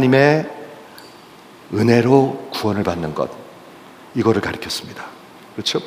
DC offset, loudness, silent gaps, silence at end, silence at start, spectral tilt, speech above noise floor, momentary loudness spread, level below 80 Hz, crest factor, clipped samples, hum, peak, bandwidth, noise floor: under 0.1%; -18 LUFS; none; 0 s; 0 s; -6 dB/octave; 26 dB; 24 LU; -54 dBFS; 18 dB; under 0.1%; none; 0 dBFS; 16 kHz; -43 dBFS